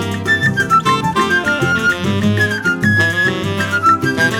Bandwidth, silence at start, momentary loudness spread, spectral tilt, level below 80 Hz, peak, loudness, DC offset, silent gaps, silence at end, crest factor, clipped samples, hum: 18 kHz; 0 s; 3 LU; -5 dB/octave; -46 dBFS; -2 dBFS; -14 LUFS; under 0.1%; none; 0 s; 14 dB; under 0.1%; none